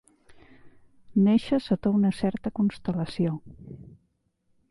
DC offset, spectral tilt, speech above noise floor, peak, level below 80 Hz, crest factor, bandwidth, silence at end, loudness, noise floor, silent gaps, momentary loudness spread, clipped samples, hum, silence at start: under 0.1%; -8.5 dB/octave; 47 dB; -10 dBFS; -56 dBFS; 16 dB; 11.5 kHz; 0.9 s; -26 LUFS; -72 dBFS; none; 23 LU; under 0.1%; none; 0.65 s